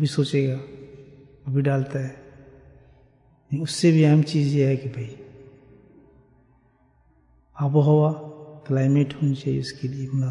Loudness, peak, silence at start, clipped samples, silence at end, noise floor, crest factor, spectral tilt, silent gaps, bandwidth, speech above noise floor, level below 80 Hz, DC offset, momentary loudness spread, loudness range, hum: -22 LUFS; -6 dBFS; 0 s; under 0.1%; 0 s; -60 dBFS; 18 dB; -7.5 dB/octave; none; 11 kHz; 39 dB; -60 dBFS; under 0.1%; 19 LU; 6 LU; none